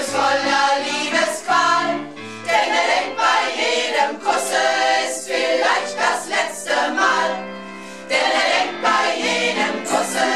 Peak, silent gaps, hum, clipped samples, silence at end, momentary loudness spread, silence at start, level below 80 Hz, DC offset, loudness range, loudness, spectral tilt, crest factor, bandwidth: -4 dBFS; none; none; under 0.1%; 0 s; 5 LU; 0 s; -70 dBFS; 0.4%; 1 LU; -18 LUFS; -1.5 dB/octave; 16 dB; 14.5 kHz